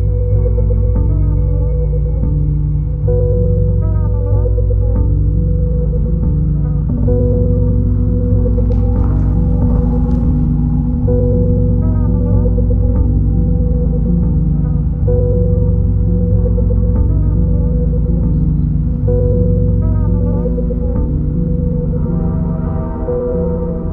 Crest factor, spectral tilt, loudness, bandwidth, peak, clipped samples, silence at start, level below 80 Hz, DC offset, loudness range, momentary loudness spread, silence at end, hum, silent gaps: 12 dB; -14 dB/octave; -15 LUFS; 1.7 kHz; 0 dBFS; under 0.1%; 0 s; -16 dBFS; under 0.1%; 1 LU; 3 LU; 0 s; none; none